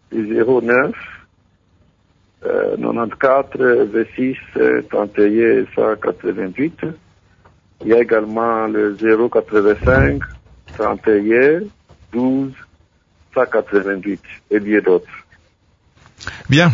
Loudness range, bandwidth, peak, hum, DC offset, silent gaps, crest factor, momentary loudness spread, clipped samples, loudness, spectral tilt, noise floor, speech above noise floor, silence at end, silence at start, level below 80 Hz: 4 LU; 7.6 kHz; 0 dBFS; none; under 0.1%; none; 16 dB; 14 LU; under 0.1%; -16 LUFS; -7.5 dB/octave; -57 dBFS; 41 dB; 0 s; 0.1 s; -38 dBFS